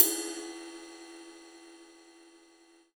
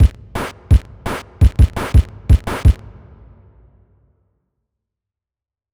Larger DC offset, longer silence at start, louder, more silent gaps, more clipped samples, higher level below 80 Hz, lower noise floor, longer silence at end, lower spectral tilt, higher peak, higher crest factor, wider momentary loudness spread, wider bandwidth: neither; about the same, 0 s vs 0 s; second, -32 LUFS vs -17 LUFS; neither; neither; second, -80 dBFS vs -18 dBFS; second, -61 dBFS vs -89 dBFS; second, 1.1 s vs 3 s; second, 0 dB/octave vs -7 dB/octave; about the same, -2 dBFS vs -2 dBFS; first, 32 dB vs 16 dB; first, 21 LU vs 13 LU; first, over 20 kHz vs 13 kHz